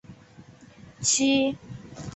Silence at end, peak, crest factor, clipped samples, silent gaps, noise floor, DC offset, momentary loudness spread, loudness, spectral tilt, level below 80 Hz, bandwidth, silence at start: 0 s; -10 dBFS; 18 dB; under 0.1%; none; -50 dBFS; under 0.1%; 19 LU; -23 LUFS; -2.5 dB/octave; -58 dBFS; 8.2 kHz; 0.1 s